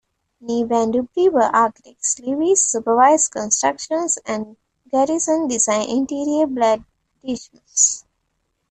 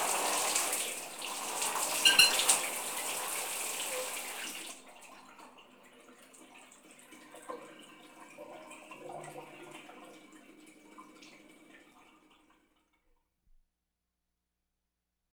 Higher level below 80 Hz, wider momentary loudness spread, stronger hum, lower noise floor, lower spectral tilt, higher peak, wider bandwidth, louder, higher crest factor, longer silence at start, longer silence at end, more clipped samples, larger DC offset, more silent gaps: first, -60 dBFS vs -74 dBFS; second, 13 LU vs 29 LU; second, none vs 60 Hz at -85 dBFS; second, -71 dBFS vs -86 dBFS; first, -2.5 dB/octave vs 1.5 dB/octave; first, -4 dBFS vs -8 dBFS; second, 9.4 kHz vs over 20 kHz; first, -18 LUFS vs -29 LUFS; second, 16 dB vs 28 dB; first, 0.45 s vs 0 s; second, 0.7 s vs 3.6 s; neither; neither; neither